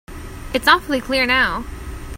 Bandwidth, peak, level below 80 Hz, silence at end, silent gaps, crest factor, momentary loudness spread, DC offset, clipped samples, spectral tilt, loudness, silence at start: 16.5 kHz; 0 dBFS; -34 dBFS; 0 s; none; 20 dB; 19 LU; under 0.1%; under 0.1%; -3.5 dB/octave; -17 LUFS; 0.1 s